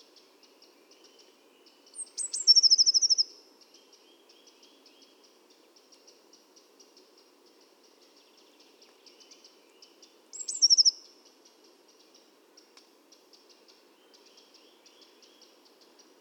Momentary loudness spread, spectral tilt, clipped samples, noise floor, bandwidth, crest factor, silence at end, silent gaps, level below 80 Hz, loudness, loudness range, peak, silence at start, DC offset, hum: 26 LU; 4.5 dB/octave; under 0.1%; -61 dBFS; 19 kHz; 24 dB; 5.3 s; none; under -90 dBFS; -21 LUFS; 7 LU; -10 dBFS; 2 s; under 0.1%; none